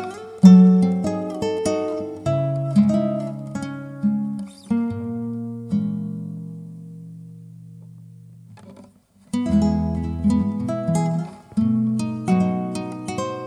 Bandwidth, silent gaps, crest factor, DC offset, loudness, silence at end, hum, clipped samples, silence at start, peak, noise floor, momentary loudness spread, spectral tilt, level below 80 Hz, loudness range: 10.5 kHz; none; 20 dB; under 0.1%; -21 LUFS; 0 s; none; under 0.1%; 0 s; 0 dBFS; -52 dBFS; 16 LU; -8 dB/octave; -44 dBFS; 12 LU